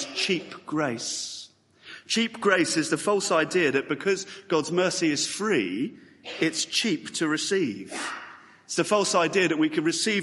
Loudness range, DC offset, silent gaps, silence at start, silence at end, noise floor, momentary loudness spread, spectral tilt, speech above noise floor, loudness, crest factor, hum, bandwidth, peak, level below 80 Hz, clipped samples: 3 LU; under 0.1%; none; 0 s; 0 s; -50 dBFS; 11 LU; -3 dB/octave; 24 dB; -25 LUFS; 22 dB; none; 11.5 kHz; -6 dBFS; -72 dBFS; under 0.1%